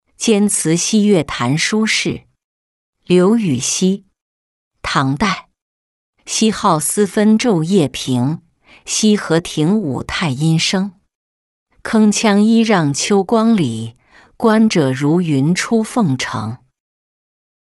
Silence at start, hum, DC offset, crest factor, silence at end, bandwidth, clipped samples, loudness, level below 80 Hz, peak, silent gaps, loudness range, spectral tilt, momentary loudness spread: 0.2 s; none; under 0.1%; 14 dB; 1.15 s; 12 kHz; under 0.1%; -15 LUFS; -48 dBFS; -2 dBFS; 2.44-2.93 s, 4.22-4.71 s, 5.62-6.13 s, 11.15-11.66 s; 3 LU; -4.5 dB/octave; 9 LU